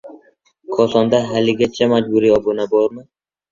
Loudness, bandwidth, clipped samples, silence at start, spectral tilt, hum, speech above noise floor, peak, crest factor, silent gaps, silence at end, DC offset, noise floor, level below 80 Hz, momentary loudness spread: -16 LUFS; 7.6 kHz; under 0.1%; 0.05 s; -6 dB/octave; none; 39 dB; -2 dBFS; 16 dB; none; 0.5 s; under 0.1%; -54 dBFS; -52 dBFS; 4 LU